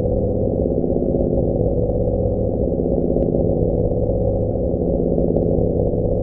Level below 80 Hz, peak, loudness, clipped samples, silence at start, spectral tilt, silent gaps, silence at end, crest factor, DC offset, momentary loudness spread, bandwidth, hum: -26 dBFS; -4 dBFS; -19 LUFS; under 0.1%; 0 s; -16.5 dB/octave; none; 0 s; 14 dB; under 0.1%; 2 LU; 1.4 kHz; none